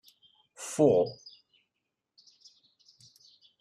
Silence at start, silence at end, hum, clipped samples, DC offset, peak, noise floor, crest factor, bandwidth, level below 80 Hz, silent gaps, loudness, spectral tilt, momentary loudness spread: 0.6 s; 2.45 s; none; under 0.1%; under 0.1%; -12 dBFS; -85 dBFS; 22 dB; 12.5 kHz; -74 dBFS; none; -27 LUFS; -6 dB/octave; 26 LU